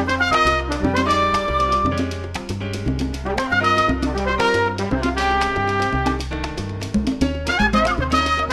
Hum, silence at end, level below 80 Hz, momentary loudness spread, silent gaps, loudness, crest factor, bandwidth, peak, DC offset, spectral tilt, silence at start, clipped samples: none; 0 s; -30 dBFS; 9 LU; none; -20 LUFS; 16 dB; 12.5 kHz; -4 dBFS; under 0.1%; -5 dB/octave; 0 s; under 0.1%